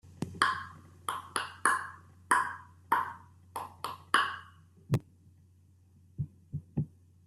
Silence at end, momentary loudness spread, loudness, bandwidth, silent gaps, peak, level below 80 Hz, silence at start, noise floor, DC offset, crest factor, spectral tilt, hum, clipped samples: 0.4 s; 16 LU; -33 LUFS; 15 kHz; none; -8 dBFS; -66 dBFS; 0.05 s; -62 dBFS; under 0.1%; 28 dB; -3.5 dB/octave; none; under 0.1%